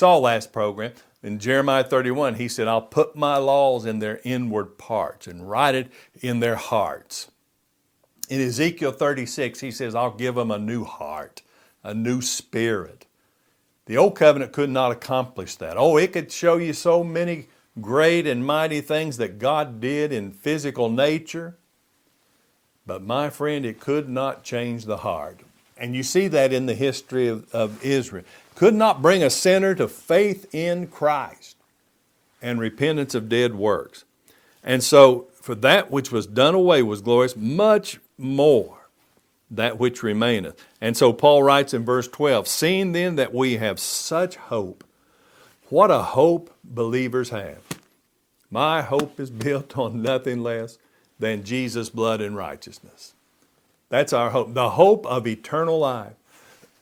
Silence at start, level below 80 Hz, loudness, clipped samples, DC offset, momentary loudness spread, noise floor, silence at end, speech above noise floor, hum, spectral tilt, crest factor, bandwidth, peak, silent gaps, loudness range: 0 s; -64 dBFS; -21 LUFS; under 0.1%; under 0.1%; 16 LU; -69 dBFS; 0.7 s; 48 dB; none; -4.5 dB/octave; 22 dB; 17 kHz; 0 dBFS; none; 8 LU